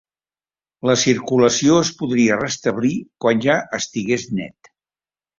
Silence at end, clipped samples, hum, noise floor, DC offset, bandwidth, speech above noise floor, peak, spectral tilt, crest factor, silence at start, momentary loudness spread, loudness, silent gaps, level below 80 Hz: 0.9 s; under 0.1%; none; under -90 dBFS; under 0.1%; 7.6 kHz; over 72 dB; -2 dBFS; -4 dB/octave; 18 dB; 0.85 s; 9 LU; -18 LUFS; none; -56 dBFS